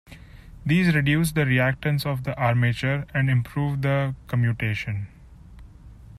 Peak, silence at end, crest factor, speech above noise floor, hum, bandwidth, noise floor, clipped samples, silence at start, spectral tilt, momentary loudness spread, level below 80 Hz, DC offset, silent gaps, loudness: -8 dBFS; 0 s; 14 dB; 23 dB; none; 13.5 kHz; -45 dBFS; under 0.1%; 0.1 s; -6.5 dB/octave; 8 LU; -46 dBFS; under 0.1%; none; -23 LUFS